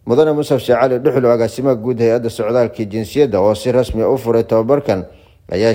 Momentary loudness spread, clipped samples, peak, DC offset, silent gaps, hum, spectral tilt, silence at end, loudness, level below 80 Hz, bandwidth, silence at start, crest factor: 6 LU; under 0.1%; -2 dBFS; under 0.1%; none; none; -7 dB/octave; 0 s; -15 LUFS; -42 dBFS; 16.5 kHz; 0.05 s; 14 dB